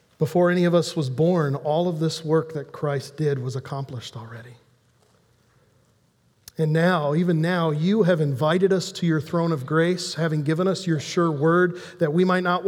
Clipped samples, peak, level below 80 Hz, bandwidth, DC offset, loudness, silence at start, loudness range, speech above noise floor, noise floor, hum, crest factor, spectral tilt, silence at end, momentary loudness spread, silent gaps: under 0.1%; -6 dBFS; -68 dBFS; 15 kHz; under 0.1%; -22 LUFS; 0.2 s; 10 LU; 41 dB; -63 dBFS; none; 16 dB; -6.5 dB/octave; 0 s; 11 LU; none